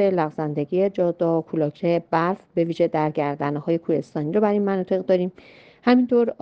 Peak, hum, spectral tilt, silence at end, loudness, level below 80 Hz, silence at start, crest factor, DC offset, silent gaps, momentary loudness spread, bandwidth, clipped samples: -6 dBFS; none; -9 dB/octave; 0.1 s; -22 LUFS; -66 dBFS; 0 s; 16 dB; under 0.1%; none; 6 LU; 6.8 kHz; under 0.1%